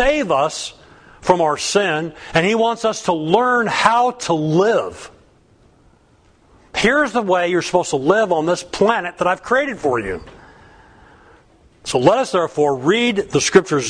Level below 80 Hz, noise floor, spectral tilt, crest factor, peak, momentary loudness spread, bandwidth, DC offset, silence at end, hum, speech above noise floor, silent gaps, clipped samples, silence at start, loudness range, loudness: -44 dBFS; -53 dBFS; -4 dB/octave; 18 dB; 0 dBFS; 8 LU; 10.5 kHz; under 0.1%; 0 s; none; 36 dB; none; under 0.1%; 0 s; 4 LU; -17 LUFS